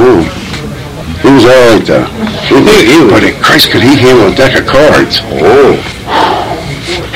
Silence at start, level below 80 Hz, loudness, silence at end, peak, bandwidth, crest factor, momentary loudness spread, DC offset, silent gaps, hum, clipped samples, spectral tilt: 0 s; -28 dBFS; -5 LUFS; 0 s; 0 dBFS; over 20 kHz; 6 dB; 13 LU; under 0.1%; none; none; 8%; -5 dB/octave